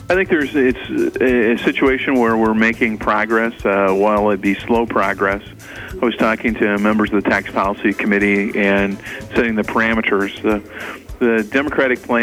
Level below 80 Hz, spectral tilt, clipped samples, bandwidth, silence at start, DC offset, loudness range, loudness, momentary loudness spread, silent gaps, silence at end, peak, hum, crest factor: -40 dBFS; -6 dB/octave; under 0.1%; 16 kHz; 0 s; under 0.1%; 2 LU; -16 LUFS; 6 LU; none; 0 s; -2 dBFS; none; 14 dB